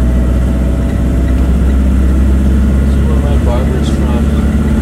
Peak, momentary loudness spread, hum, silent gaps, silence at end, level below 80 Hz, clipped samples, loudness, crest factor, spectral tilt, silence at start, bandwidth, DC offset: 0 dBFS; 2 LU; none; none; 0 s; -12 dBFS; under 0.1%; -12 LUFS; 10 dB; -8 dB/octave; 0 s; 11 kHz; under 0.1%